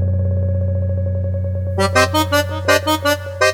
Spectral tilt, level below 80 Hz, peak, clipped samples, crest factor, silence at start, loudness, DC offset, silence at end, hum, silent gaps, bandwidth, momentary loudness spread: -5 dB/octave; -40 dBFS; 0 dBFS; under 0.1%; 16 dB; 0 s; -17 LUFS; under 0.1%; 0 s; none; none; 17 kHz; 6 LU